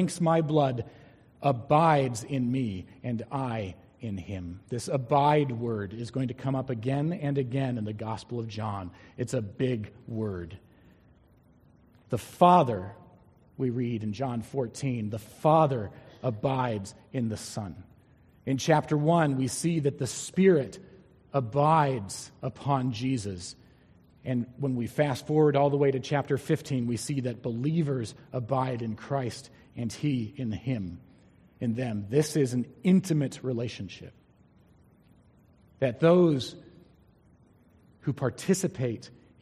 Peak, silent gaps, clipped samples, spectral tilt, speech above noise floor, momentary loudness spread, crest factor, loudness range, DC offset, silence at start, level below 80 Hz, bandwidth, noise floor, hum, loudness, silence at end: -6 dBFS; none; under 0.1%; -6.5 dB/octave; 32 dB; 15 LU; 22 dB; 6 LU; under 0.1%; 0 s; -62 dBFS; 14 kHz; -60 dBFS; none; -28 LUFS; 0.3 s